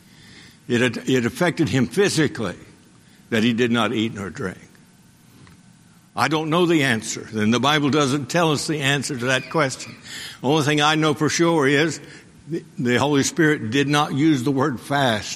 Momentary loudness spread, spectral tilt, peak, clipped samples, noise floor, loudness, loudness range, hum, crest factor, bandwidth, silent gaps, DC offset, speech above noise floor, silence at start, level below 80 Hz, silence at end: 12 LU; -4.5 dB/octave; -2 dBFS; under 0.1%; -51 dBFS; -20 LUFS; 5 LU; none; 20 dB; 14.5 kHz; none; under 0.1%; 31 dB; 0.35 s; -58 dBFS; 0 s